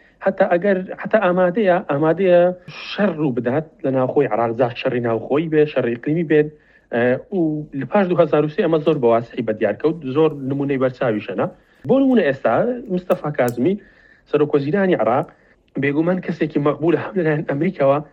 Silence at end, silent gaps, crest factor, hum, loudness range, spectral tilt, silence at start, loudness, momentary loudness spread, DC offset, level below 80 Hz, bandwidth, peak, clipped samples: 0.1 s; none; 18 dB; none; 2 LU; -8.5 dB/octave; 0.2 s; -19 LUFS; 7 LU; under 0.1%; -58 dBFS; 13 kHz; 0 dBFS; under 0.1%